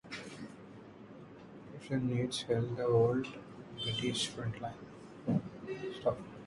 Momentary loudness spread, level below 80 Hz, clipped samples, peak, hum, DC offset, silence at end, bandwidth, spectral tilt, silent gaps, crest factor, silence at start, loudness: 21 LU; -64 dBFS; under 0.1%; -16 dBFS; none; under 0.1%; 0 s; 11.5 kHz; -5.5 dB/octave; none; 20 dB; 0.05 s; -35 LUFS